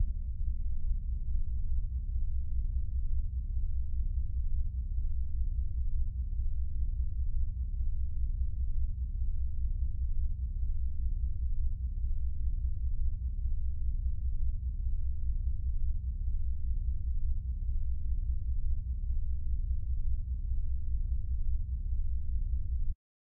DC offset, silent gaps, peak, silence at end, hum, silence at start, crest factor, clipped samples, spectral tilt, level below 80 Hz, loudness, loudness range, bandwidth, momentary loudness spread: under 0.1%; none; -20 dBFS; 0.3 s; none; 0 s; 10 dB; under 0.1%; -18.5 dB/octave; -32 dBFS; -37 LUFS; 0 LU; 0.6 kHz; 1 LU